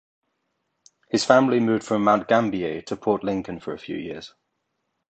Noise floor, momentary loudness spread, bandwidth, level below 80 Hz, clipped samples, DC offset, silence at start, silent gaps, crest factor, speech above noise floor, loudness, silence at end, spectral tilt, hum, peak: -77 dBFS; 15 LU; 9 kHz; -60 dBFS; under 0.1%; under 0.1%; 1.15 s; none; 22 dB; 55 dB; -22 LUFS; 0.8 s; -5.5 dB/octave; none; -2 dBFS